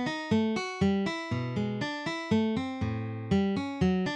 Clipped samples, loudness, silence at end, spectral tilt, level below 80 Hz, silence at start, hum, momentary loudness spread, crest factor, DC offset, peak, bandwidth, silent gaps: under 0.1%; -30 LUFS; 0 s; -6.5 dB/octave; -54 dBFS; 0 s; none; 5 LU; 14 dB; under 0.1%; -14 dBFS; 9.2 kHz; none